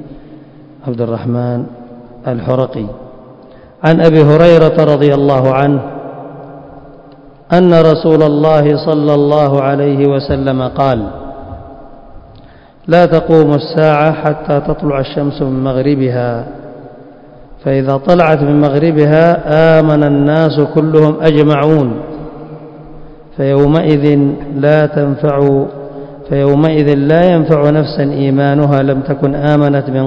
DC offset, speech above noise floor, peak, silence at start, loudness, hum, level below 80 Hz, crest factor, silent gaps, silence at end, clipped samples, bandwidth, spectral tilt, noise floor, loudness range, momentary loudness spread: under 0.1%; 29 dB; 0 dBFS; 0 s; -10 LUFS; none; -38 dBFS; 10 dB; none; 0 s; 1%; 6.8 kHz; -9.5 dB/octave; -38 dBFS; 6 LU; 18 LU